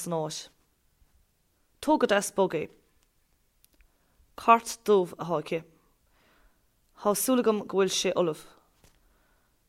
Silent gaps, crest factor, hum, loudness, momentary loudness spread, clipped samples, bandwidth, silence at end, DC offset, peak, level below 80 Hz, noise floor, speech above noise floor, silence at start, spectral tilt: none; 24 dB; none; -27 LUFS; 13 LU; under 0.1%; 16 kHz; 1.25 s; under 0.1%; -6 dBFS; -66 dBFS; -70 dBFS; 43 dB; 0 s; -4 dB/octave